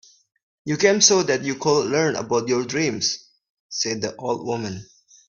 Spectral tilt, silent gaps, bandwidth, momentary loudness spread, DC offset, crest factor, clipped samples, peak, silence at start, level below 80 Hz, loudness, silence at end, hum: -3 dB/octave; 3.50-3.70 s; 7.4 kHz; 16 LU; under 0.1%; 22 dB; under 0.1%; -2 dBFS; 0.65 s; -62 dBFS; -21 LUFS; 0.45 s; none